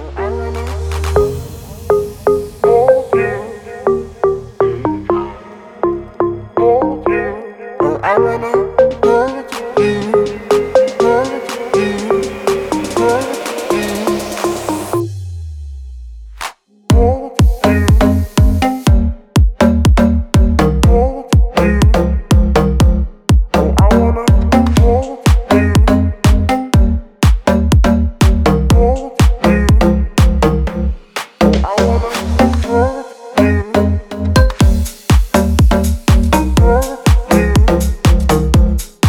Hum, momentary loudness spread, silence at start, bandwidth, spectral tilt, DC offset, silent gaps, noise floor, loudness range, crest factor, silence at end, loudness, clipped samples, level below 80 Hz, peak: none; 9 LU; 0 s; 17 kHz; -6.5 dB/octave; under 0.1%; none; -34 dBFS; 5 LU; 12 dB; 0 s; -13 LUFS; under 0.1%; -16 dBFS; 0 dBFS